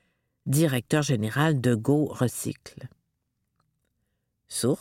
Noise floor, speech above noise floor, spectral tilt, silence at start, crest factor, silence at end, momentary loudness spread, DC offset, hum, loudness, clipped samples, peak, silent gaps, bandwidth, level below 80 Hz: -78 dBFS; 53 dB; -5.5 dB/octave; 0.45 s; 18 dB; 0 s; 16 LU; under 0.1%; none; -26 LUFS; under 0.1%; -10 dBFS; none; 16.5 kHz; -64 dBFS